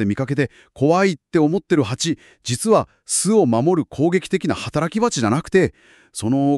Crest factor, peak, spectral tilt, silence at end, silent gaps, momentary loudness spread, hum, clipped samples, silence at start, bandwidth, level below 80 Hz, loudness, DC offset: 16 dB; -4 dBFS; -5 dB/octave; 0 s; none; 7 LU; none; under 0.1%; 0 s; 13.5 kHz; -52 dBFS; -19 LUFS; under 0.1%